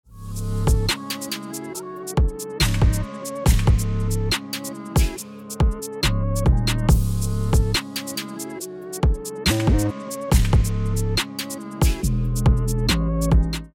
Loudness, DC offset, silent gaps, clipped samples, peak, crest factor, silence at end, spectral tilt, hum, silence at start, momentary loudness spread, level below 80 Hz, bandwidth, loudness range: -23 LUFS; under 0.1%; none; under 0.1%; -4 dBFS; 16 dB; 0.05 s; -5 dB/octave; none; 0.1 s; 11 LU; -24 dBFS; 17.5 kHz; 1 LU